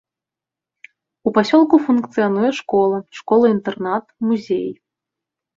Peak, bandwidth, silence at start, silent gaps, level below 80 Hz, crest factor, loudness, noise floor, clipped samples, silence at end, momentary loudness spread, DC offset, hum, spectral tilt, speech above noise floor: -2 dBFS; 7.6 kHz; 1.25 s; none; -62 dBFS; 16 dB; -18 LUFS; -87 dBFS; under 0.1%; 0.85 s; 9 LU; under 0.1%; none; -6.5 dB/octave; 71 dB